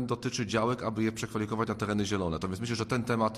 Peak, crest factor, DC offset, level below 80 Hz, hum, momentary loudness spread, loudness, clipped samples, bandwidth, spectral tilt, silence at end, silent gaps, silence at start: -14 dBFS; 16 dB; under 0.1%; -54 dBFS; none; 4 LU; -31 LUFS; under 0.1%; 14 kHz; -5.5 dB/octave; 0 s; none; 0 s